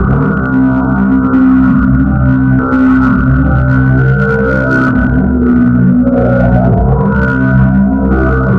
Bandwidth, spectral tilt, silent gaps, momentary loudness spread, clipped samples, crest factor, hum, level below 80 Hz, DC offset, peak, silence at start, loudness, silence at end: 4.6 kHz; -11 dB/octave; none; 2 LU; under 0.1%; 8 dB; none; -18 dBFS; under 0.1%; 0 dBFS; 0 s; -9 LUFS; 0 s